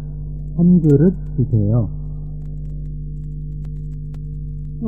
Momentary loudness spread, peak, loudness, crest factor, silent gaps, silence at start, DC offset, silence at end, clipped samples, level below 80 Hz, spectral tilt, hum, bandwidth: 16 LU; -2 dBFS; -20 LUFS; 18 dB; none; 0 s; 2%; 0 s; under 0.1%; -30 dBFS; -13 dB/octave; none; 1.7 kHz